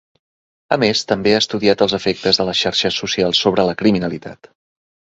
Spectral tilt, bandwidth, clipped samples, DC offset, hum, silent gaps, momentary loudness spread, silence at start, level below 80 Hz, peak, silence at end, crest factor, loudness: -4 dB/octave; 8 kHz; under 0.1%; under 0.1%; none; none; 6 LU; 0.7 s; -50 dBFS; 0 dBFS; 0.8 s; 18 dB; -16 LUFS